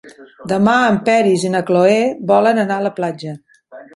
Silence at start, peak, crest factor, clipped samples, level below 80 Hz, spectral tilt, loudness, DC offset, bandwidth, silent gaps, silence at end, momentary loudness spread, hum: 0.05 s; 0 dBFS; 14 dB; under 0.1%; -58 dBFS; -6 dB/octave; -15 LUFS; under 0.1%; 11.5 kHz; none; 0.1 s; 15 LU; none